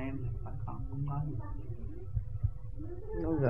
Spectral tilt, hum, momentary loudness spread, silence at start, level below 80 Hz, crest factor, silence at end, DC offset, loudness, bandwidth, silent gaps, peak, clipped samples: -11.5 dB/octave; none; 8 LU; 0 s; -42 dBFS; 22 dB; 0 s; 0.8%; -40 LUFS; 3.1 kHz; none; -14 dBFS; under 0.1%